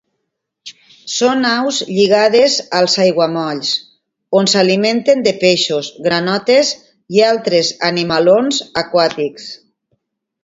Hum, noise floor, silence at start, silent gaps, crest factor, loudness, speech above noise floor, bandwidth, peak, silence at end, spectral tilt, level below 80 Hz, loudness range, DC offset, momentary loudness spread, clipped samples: none; -74 dBFS; 0.65 s; none; 14 dB; -14 LUFS; 60 dB; 8 kHz; 0 dBFS; 0.9 s; -3.5 dB/octave; -58 dBFS; 1 LU; under 0.1%; 7 LU; under 0.1%